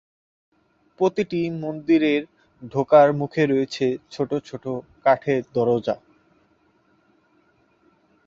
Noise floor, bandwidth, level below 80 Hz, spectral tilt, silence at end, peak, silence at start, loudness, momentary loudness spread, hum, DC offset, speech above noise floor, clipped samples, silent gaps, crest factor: -62 dBFS; 7.6 kHz; -64 dBFS; -7 dB/octave; 2.3 s; -2 dBFS; 1 s; -22 LUFS; 13 LU; none; under 0.1%; 41 dB; under 0.1%; none; 20 dB